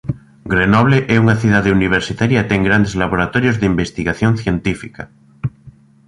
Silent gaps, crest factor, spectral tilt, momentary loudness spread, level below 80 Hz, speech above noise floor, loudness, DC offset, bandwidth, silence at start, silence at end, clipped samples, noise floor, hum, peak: none; 14 dB; -7 dB/octave; 14 LU; -36 dBFS; 29 dB; -15 LUFS; under 0.1%; 11 kHz; 0.05 s; 0.4 s; under 0.1%; -43 dBFS; none; 0 dBFS